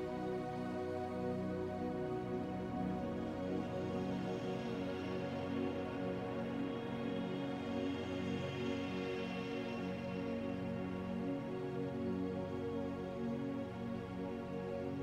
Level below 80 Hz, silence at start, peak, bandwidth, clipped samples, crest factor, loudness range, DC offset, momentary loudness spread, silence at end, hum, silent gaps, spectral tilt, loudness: -66 dBFS; 0 s; -26 dBFS; 11.5 kHz; under 0.1%; 14 dB; 1 LU; under 0.1%; 2 LU; 0 s; none; none; -7.5 dB/octave; -41 LUFS